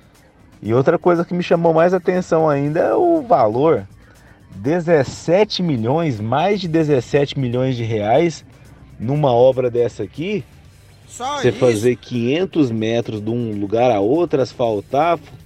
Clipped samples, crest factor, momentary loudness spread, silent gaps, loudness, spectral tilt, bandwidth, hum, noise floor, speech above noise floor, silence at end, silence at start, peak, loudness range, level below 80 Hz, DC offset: under 0.1%; 16 dB; 8 LU; none; -17 LUFS; -7 dB/octave; 13 kHz; none; -48 dBFS; 32 dB; 0.1 s; 0.6 s; -2 dBFS; 4 LU; -50 dBFS; under 0.1%